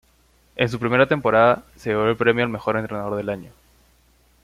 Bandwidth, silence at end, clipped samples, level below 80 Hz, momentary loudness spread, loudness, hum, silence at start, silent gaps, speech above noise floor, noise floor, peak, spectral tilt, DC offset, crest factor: 14.5 kHz; 0.95 s; under 0.1%; -52 dBFS; 11 LU; -21 LUFS; none; 0.55 s; none; 38 dB; -58 dBFS; -4 dBFS; -7 dB/octave; under 0.1%; 18 dB